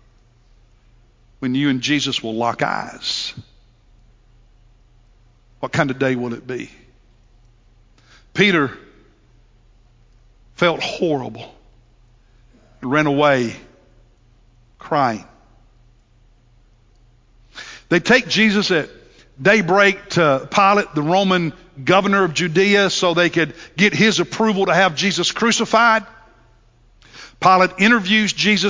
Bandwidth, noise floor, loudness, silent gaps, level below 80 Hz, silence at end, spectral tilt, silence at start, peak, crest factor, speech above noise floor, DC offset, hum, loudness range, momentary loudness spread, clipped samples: 7.6 kHz; -53 dBFS; -17 LUFS; none; -52 dBFS; 0 s; -4.5 dB/octave; 1.4 s; 0 dBFS; 20 dB; 36 dB; under 0.1%; none; 10 LU; 13 LU; under 0.1%